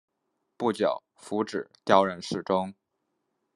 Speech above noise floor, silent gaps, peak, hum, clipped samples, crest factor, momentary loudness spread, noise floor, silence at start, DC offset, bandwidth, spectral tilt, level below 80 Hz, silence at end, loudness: 52 dB; none; -4 dBFS; none; under 0.1%; 24 dB; 12 LU; -79 dBFS; 0.6 s; under 0.1%; 12 kHz; -5.5 dB/octave; -74 dBFS; 0.85 s; -28 LUFS